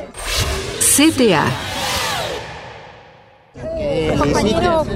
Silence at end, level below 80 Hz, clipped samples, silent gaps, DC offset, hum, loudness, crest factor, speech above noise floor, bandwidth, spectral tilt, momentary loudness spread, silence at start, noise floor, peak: 0 s; -34 dBFS; under 0.1%; none; under 0.1%; none; -16 LUFS; 18 dB; 31 dB; 16 kHz; -3.5 dB/octave; 20 LU; 0 s; -46 dBFS; 0 dBFS